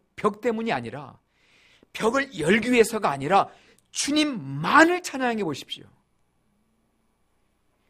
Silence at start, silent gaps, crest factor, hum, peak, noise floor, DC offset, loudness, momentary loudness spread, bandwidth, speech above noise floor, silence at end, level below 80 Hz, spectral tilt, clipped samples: 0.2 s; none; 22 dB; none; -2 dBFS; -69 dBFS; under 0.1%; -23 LUFS; 16 LU; 15.5 kHz; 45 dB; 2.15 s; -60 dBFS; -4 dB/octave; under 0.1%